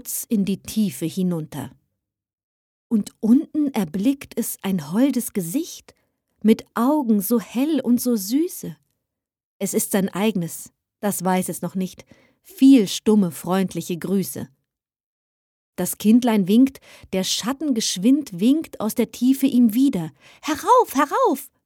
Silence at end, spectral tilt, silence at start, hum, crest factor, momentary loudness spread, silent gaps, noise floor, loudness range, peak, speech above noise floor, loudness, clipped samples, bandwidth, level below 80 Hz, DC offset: 0.2 s; -5 dB/octave; 0.05 s; none; 18 dB; 12 LU; 2.33-2.90 s, 9.45-9.60 s, 15.00-15.73 s; -82 dBFS; 5 LU; -4 dBFS; 61 dB; -21 LUFS; under 0.1%; 18.5 kHz; -62 dBFS; under 0.1%